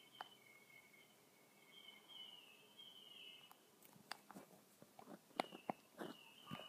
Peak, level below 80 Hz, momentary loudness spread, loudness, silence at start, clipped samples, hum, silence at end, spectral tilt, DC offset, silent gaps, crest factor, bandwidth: -20 dBFS; under -90 dBFS; 16 LU; -57 LUFS; 0 s; under 0.1%; none; 0 s; -3.5 dB/octave; under 0.1%; none; 38 dB; 15.5 kHz